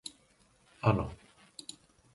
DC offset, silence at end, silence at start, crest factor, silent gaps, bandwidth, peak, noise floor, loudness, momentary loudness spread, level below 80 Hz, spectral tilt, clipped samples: under 0.1%; 1 s; 0.05 s; 26 dB; none; 11.5 kHz; -10 dBFS; -67 dBFS; -32 LUFS; 20 LU; -54 dBFS; -6.5 dB/octave; under 0.1%